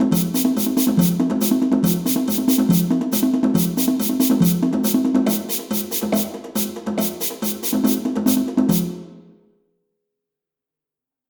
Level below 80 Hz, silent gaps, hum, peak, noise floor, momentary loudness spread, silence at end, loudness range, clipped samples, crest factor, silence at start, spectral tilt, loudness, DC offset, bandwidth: -54 dBFS; none; none; -4 dBFS; -87 dBFS; 6 LU; 2.1 s; 4 LU; under 0.1%; 16 dB; 0 s; -5.5 dB/octave; -19 LUFS; under 0.1%; over 20 kHz